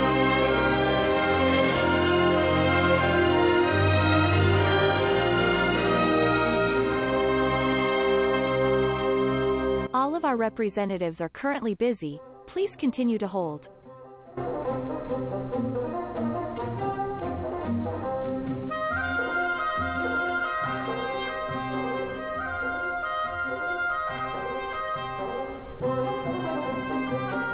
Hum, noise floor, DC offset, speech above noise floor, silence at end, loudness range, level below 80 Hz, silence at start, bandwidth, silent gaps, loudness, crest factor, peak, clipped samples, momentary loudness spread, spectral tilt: none; -47 dBFS; under 0.1%; 18 dB; 0 s; 9 LU; -44 dBFS; 0 s; 4 kHz; none; -26 LUFS; 14 dB; -12 dBFS; under 0.1%; 10 LU; -10 dB/octave